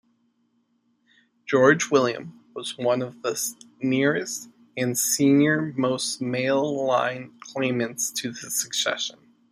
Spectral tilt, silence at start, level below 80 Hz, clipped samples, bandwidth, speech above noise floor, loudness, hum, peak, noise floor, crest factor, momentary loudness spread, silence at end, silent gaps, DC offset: -3.5 dB/octave; 1.45 s; -70 dBFS; under 0.1%; 15.5 kHz; 45 dB; -24 LUFS; none; -4 dBFS; -69 dBFS; 22 dB; 15 LU; 0.4 s; none; under 0.1%